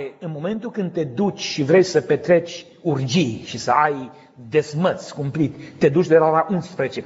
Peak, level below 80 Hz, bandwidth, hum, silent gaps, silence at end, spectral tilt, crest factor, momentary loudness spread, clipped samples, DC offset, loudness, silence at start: -2 dBFS; -62 dBFS; 8 kHz; none; none; 0 s; -5.5 dB/octave; 18 dB; 12 LU; under 0.1%; under 0.1%; -20 LUFS; 0 s